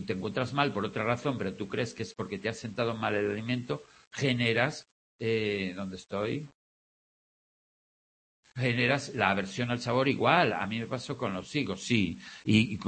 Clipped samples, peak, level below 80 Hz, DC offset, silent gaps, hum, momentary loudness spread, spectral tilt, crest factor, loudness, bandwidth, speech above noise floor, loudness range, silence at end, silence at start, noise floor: under 0.1%; -8 dBFS; -64 dBFS; under 0.1%; 4.07-4.11 s, 4.92-5.19 s, 6.55-8.43 s; none; 11 LU; -5.5 dB/octave; 24 dB; -30 LUFS; 8.8 kHz; over 60 dB; 8 LU; 0 s; 0 s; under -90 dBFS